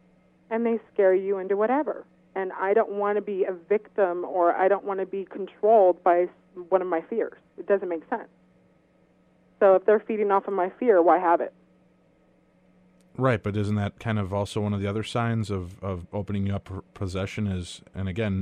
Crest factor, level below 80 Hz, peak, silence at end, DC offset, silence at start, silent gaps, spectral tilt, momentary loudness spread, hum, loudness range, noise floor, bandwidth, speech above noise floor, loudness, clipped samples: 18 dB; -58 dBFS; -6 dBFS; 0 s; under 0.1%; 0.5 s; none; -7.5 dB/octave; 14 LU; none; 7 LU; -62 dBFS; 10.5 kHz; 37 dB; -25 LUFS; under 0.1%